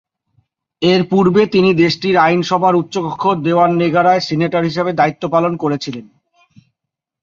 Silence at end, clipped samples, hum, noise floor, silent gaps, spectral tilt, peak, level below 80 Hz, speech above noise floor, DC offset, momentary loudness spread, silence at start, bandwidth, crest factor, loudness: 1.2 s; under 0.1%; none; -81 dBFS; none; -6.5 dB/octave; 0 dBFS; -56 dBFS; 67 dB; under 0.1%; 7 LU; 0.8 s; 7.4 kHz; 14 dB; -14 LUFS